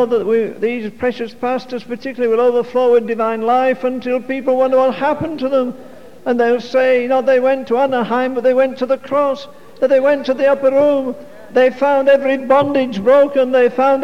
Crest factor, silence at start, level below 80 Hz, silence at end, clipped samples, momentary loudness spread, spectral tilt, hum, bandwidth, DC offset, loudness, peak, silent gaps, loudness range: 14 dB; 0 s; -58 dBFS; 0 s; under 0.1%; 8 LU; -6 dB/octave; none; 7.2 kHz; 1%; -15 LUFS; -2 dBFS; none; 3 LU